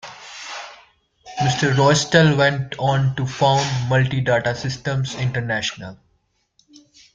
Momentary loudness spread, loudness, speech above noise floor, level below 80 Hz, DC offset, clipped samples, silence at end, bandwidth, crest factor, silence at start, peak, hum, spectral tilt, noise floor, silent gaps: 19 LU; -19 LUFS; 48 dB; -52 dBFS; under 0.1%; under 0.1%; 1.2 s; 8.8 kHz; 18 dB; 0.05 s; -2 dBFS; none; -5 dB/octave; -66 dBFS; none